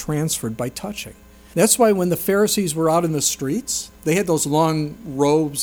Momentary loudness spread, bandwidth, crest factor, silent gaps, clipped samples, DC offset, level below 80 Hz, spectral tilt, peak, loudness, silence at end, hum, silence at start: 12 LU; over 20 kHz; 18 dB; none; under 0.1%; under 0.1%; -50 dBFS; -4.5 dB/octave; -2 dBFS; -19 LUFS; 0 s; none; 0 s